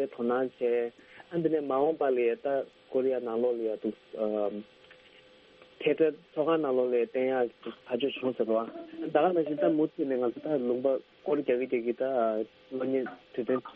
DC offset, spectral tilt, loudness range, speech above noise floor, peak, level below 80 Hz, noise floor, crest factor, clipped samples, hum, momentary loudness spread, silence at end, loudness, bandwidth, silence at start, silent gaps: under 0.1%; -5 dB/octave; 3 LU; 28 dB; -10 dBFS; -76 dBFS; -57 dBFS; 20 dB; under 0.1%; none; 8 LU; 0.05 s; -30 LUFS; 5 kHz; 0 s; none